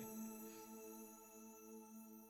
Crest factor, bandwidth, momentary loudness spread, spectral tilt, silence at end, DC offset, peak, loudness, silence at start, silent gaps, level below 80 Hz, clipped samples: 14 dB; over 20 kHz; 7 LU; -4 dB/octave; 0 s; under 0.1%; -42 dBFS; -56 LUFS; 0 s; none; -88 dBFS; under 0.1%